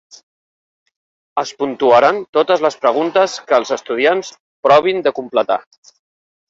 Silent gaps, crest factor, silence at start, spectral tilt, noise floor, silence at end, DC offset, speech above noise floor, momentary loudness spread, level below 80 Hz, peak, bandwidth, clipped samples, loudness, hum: 2.29-2.33 s, 4.40-4.63 s; 16 dB; 1.35 s; -4 dB/octave; under -90 dBFS; 0.9 s; under 0.1%; over 75 dB; 10 LU; -64 dBFS; 0 dBFS; 7.8 kHz; under 0.1%; -15 LUFS; none